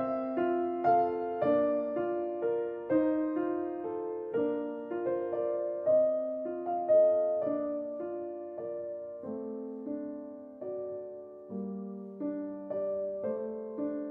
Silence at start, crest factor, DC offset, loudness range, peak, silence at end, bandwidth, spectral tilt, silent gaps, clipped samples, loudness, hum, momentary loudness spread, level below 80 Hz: 0 s; 16 dB; under 0.1%; 10 LU; -16 dBFS; 0 s; 3.8 kHz; -7.5 dB/octave; none; under 0.1%; -32 LUFS; none; 13 LU; -74 dBFS